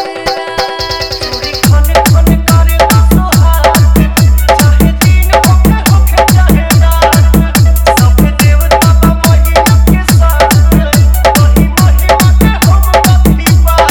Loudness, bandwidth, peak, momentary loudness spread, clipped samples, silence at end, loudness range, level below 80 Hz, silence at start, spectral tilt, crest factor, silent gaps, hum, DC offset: -7 LUFS; over 20 kHz; 0 dBFS; 3 LU; 2%; 0 s; 1 LU; -10 dBFS; 0 s; -5.5 dB/octave; 6 dB; none; none; under 0.1%